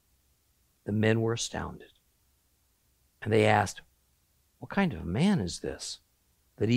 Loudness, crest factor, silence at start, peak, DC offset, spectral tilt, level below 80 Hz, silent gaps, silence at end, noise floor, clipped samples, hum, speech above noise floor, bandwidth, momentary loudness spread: -29 LUFS; 22 dB; 0.85 s; -8 dBFS; under 0.1%; -5.5 dB/octave; -58 dBFS; none; 0 s; -71 dBFS; under 0.1%; none; 42 dB; 15 kHz; 19 LU